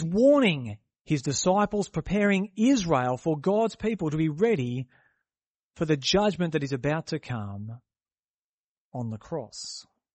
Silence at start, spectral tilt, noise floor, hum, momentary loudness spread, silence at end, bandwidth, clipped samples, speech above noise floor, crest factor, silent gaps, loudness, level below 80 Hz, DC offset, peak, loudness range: 0 s; -5.5 dB/octave; under -90 dBFS; none; 15 LU; 0.35 s; 8.4 kHz; under 0.1%; over 64 dB; 18 dB; 1.01-1.05 s, 5.46-5.71 s, 8.19-8.91 s; -26 LUFS; -54 dBFS; under 0.1%; -10 dBFS; 8 LU